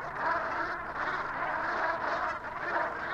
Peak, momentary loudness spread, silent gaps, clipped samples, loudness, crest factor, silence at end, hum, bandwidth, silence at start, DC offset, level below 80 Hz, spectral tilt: -16 dBFS; 3 LU; none; under 0.1%; -32 LUFS; 16 dB; 0 s; none; 12 kHz; 0 s; under 0.1%; -58 dBFS; -5 dB/octave